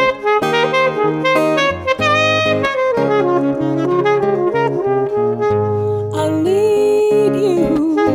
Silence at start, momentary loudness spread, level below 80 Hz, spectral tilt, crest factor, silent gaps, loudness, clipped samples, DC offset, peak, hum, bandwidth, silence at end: 0 s; 4 LU; -50 dBFS; -6 dB/octave; 12 dB; none; -15 LUFS; under 0.1%; under 0.1%; -2 dBFS; none; 15.5 kHz; 0 s